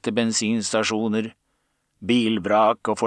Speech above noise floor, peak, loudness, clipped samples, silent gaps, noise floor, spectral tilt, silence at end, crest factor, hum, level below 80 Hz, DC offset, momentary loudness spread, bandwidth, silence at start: 50 dB; -6 dBFS; -22 LUFS; under 0.1%; none; -71 dBFS; -4 dB/octave; 0 s; 16 dB; none; -66 dBFS; under 0.1%; 8 LU; 9.8 kHz; 0.05 s